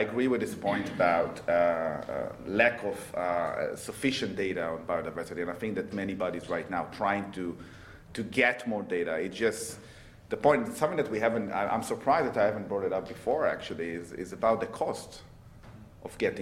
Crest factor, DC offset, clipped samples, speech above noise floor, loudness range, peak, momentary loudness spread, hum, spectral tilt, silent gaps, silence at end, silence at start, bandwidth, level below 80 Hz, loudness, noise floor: 22 dB; under 0.1%; under 0.1%; 20 dB; 4 LU; -8 dBFS; 12 LU; none; -5 dB/octave; none; 0 s; 0 s; 15.5 kHz; -60 dBFS; -30 LUFS; -50 dBFS